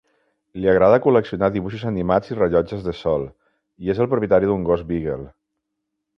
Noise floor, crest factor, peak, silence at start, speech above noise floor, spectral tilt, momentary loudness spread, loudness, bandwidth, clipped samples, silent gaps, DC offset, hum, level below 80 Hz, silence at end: -78 dBFS; 18 dB; -2 dBFS; 0.55 s; 59 dB; -9 dB/octave; 12 LU; -20 LUFS; 6.4 kHz; under 0.1%; none; under 0.1%; none; -44 dBFS; 0.9 s